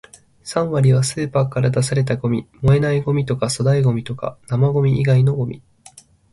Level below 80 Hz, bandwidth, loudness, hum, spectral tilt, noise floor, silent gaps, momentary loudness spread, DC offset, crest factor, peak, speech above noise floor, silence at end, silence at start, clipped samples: -44 dBFS; 11.5 kHz; -18 LUFS; none; -6.5 dB/octave; -47 dBFS; none; 9 LU; under 0.1%; 16 dB; -2 dBFS; 30 dB; 0.75 s; 0.45 s; under 0.1%